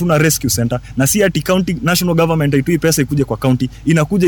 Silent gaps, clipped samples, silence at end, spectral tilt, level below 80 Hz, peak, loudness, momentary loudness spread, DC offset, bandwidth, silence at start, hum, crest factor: none; under 0.1%; 0 s; -5 dB/octave; -36 dBFS; -2 dBFS; -15 LUFS; 4 LU; under 0.1%; 19 kHz; 0 s; none; 12 dB